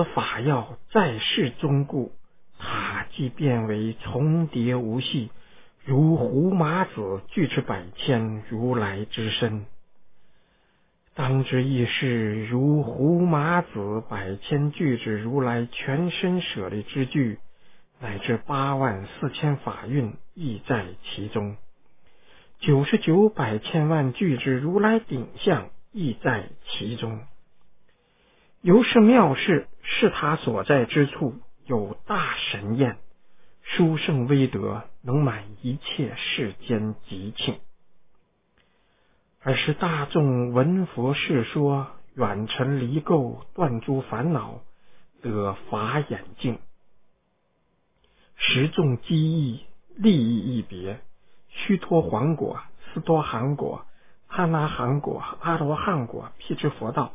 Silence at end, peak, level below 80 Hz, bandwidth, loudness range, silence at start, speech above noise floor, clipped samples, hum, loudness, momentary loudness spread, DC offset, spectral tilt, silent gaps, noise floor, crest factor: 0 s; -4 dBFS; -54 dBFS; 3.8 kHz; 7 LU; 0 s; 46 dB; under 0.1%; none; -24 LUFS; 12 LU; under 0.1%; -11 dB/octave; none; -70 dBFS; 22 dB